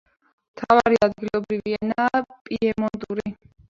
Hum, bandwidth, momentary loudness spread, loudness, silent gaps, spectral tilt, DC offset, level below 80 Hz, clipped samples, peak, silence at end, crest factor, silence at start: none; 7.6 kHz; 12 LU; -22 LUFS; 2.41-2.45 s; -6.5 dB/octave; under 0.1%; -54 dBFS; under 0.1%; -2 dBFS; 0.35 s; 22 dB; 0.55 s